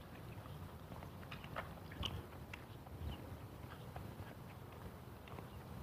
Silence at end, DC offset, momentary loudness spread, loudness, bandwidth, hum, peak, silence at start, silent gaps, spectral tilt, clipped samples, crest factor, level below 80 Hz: 0 s; under 0.1%; 8 LU; -51 LUFS; 15.5 kHz; none; -28 dBFS; 0 s; none; -5.5 dB/octave; under 0.1%; 24 dB; -58 dBFS